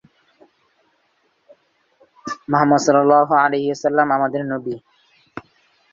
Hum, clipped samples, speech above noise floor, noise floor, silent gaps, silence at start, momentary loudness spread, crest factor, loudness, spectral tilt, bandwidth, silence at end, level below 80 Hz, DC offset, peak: none; under 0.1%; 48 dB; -64 dBFS; none; 2.25 s; 24 LU; 18 dB; -17 LUFS; -5.5 dB/octave; 7.6 kHz; 0.55 s; -64 dBFS; under 0.1%; -2 dBFS